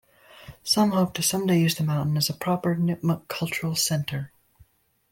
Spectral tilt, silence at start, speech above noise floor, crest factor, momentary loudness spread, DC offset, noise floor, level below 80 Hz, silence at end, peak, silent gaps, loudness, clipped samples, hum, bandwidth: -4.5 dB/octave; 0.35 s; 36 dB; 16 dB; 8 LU; under 0.1%; -60 dBFS; -60 dBFS; 0.85 s; -10 dBFS; none; -24 LUFS; under 0.1%; none; 17 kHz